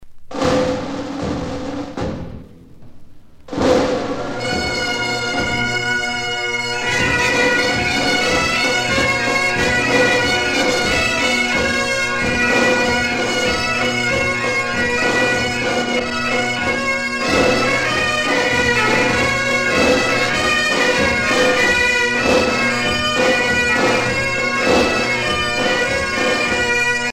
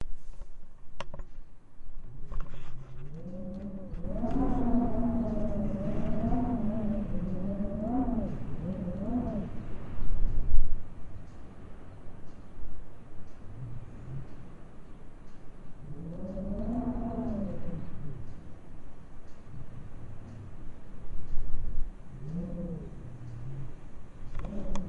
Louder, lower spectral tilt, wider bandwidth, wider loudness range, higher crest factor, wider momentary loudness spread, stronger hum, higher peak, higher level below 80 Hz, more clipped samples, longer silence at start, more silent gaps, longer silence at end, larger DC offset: first, -16 LUFS vs -36 LUFS; second, -3 dB/octave vs -9 dB/octave; first, 16.5 kHz vs 3 kHz; second, 6 LU vs 15 LU; second, 16 dB vs 22 dB; second, 6 LU vs 21 LU; neither; first, -2 dBFS vs -6 dBFS; about the same, -38 dBFS vs -36 dBFS; neither; about the same, 0 s vs 0 s; neither; about the same, 0 s vs 0 s; neither